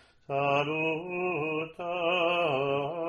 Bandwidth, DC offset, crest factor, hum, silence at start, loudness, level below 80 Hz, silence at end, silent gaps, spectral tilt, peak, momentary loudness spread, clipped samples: 11 kHz; under 0.1%; 16 dB; none; 0.3 s; -29 LUFS; -68 dBFS; 0 s; none; -6.5 dB/octave; -12 dBFS; 7 LU; under 0.1%